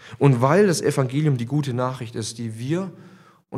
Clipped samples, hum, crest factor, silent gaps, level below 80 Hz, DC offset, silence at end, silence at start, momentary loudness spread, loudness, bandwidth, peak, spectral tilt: under 0.1%; none; 20 dB; none; -66 dBFS; under 0.1%; 0 s; 0.05 s; 13 LU; -22 LUFS; 13.5 kHz; -2 dBFS; -6.5 dB/octave